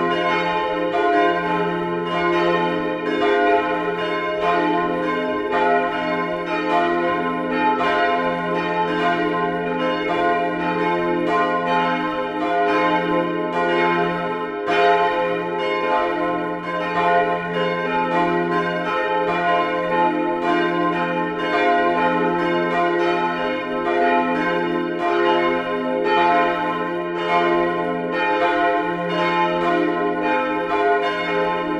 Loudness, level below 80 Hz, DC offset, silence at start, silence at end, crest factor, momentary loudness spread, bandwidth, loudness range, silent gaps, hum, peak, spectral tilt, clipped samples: -20 LUFS; -54 dBFS; under 0.1%; 0 s; 0 s; 14 dB; 5 LU; 10 kHz; 1 LU; none; none; -4 dBFS; -6.5 dB/octave; under 0.1%